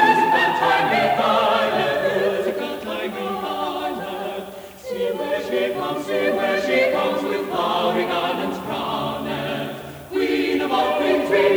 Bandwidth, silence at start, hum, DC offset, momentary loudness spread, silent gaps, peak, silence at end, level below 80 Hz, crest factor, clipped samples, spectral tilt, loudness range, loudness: over 20 kHz; 0 s; none; under 0.1%; 10 LU; none; -4 dBFS; 0 s; -56 dBFS; 18 dB; under 0.1%; -4.5 dB/octave; 6 LU; -21 LUFS